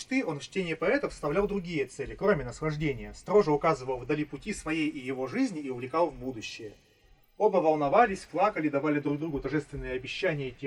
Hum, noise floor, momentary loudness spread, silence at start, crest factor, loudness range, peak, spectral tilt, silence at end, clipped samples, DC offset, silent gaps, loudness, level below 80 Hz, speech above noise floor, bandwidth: none; -61 dBFS; 11 LU; 0 s; 20 dB; 4 LU; -8 dBFS; -6 dB/octave; 0 s; under 0.1%; under 0.1%; none; -29 LUFS; -52 dBFS; 32 dB; 11.5 kHz